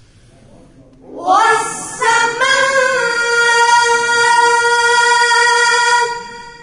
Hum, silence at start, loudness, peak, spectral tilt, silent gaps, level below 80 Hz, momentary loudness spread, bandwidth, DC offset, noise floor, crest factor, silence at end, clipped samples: none; 1.1 s; -11 LUFS; 0 dBFS; 0 dB/octave; none; -52 dBFS; 7 LU; 11 kHz; under 0.1%; -44 dBFS; 12 dB; 0 s; under 0.1%